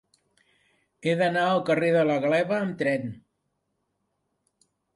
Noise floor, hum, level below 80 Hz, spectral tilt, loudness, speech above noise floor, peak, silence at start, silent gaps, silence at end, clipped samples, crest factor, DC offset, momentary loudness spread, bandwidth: -77 dBFS; none; -70 dBFS; -6.5 dB/octave; -24 LUFS; 53 dB; -10 dBFS; 1.05 s; none; 1.75 s; under 0.1%; 18 dB; under 0.1%; 8 LU; 11.5 kHz